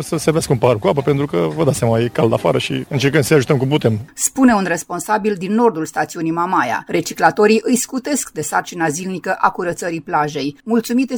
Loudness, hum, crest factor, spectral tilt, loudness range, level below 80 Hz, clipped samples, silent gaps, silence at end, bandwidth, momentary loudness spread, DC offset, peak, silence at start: -17 LUFS; none; 16 dB; -5 dB/octave; 2 LU; -50 dBFS; under 0.1%; none; 0 s; over 20 kHz; 7 LU; under 0.1%; 0 dBFS; 0 s